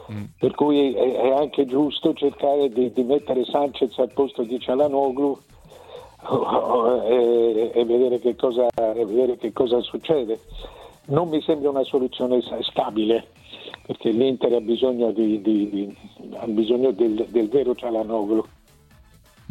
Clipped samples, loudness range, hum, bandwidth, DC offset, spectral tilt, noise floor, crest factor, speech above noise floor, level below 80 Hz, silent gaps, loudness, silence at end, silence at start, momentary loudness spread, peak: under 0.1%; 3 LU; none; 11 kHz; under 0.1%; -7.5 dB/octave; -53 dBFS; 16 dB; 32 dB; -54 dBFS; none; -22 LUFS; 1.05 s; 0 s; 10 LU; -6 dBFS